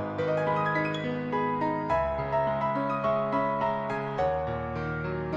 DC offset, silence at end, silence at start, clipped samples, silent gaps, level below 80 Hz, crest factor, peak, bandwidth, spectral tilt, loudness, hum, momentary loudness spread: under 0.1%; 0 s; 0 s; under 0.1%; none; -48 dBFS; 14 dB; -16 dBFS; 7.6 kHz; -8 dB/octave; -29 LUFS; none; 5 LU